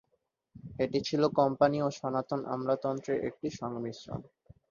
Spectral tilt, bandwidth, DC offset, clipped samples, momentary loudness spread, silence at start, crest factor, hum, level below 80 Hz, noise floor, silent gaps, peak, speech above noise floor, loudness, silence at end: -6.5 dB/octave; 7.4 kHz; under 0.1%; under 0.1%; 15 LU; 0.55 s; 22 dB; none; -64 dBFS; -78 dBFS; none; -10 dBFS; 47 dB; -31 LUFS; 0.45 s